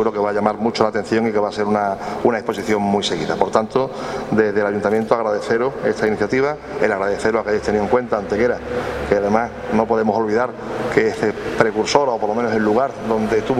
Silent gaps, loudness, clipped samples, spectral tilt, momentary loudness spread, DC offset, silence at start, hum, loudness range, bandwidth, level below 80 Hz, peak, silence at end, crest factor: none; -19 LUFS; under 0.1%; -5.5 dB/octave; 4 LU; under 0.1%; 0 s; none; 1 LU; 12 kHz; -44 dBFS; 0 dBFS; 0 s; 18 dB